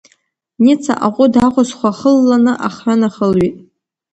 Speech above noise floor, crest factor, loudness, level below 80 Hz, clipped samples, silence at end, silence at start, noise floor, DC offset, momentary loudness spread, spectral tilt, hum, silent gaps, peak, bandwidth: 47 dB; 14 dB; -13 LUFS; -48 dBFS; under 0.1%; 0.55 s; 0.6 s; -59 dBFS; under 0.1%; 5 LU; -6.5 dB/octave; none; none; 0 dBFS; 8.8 kHz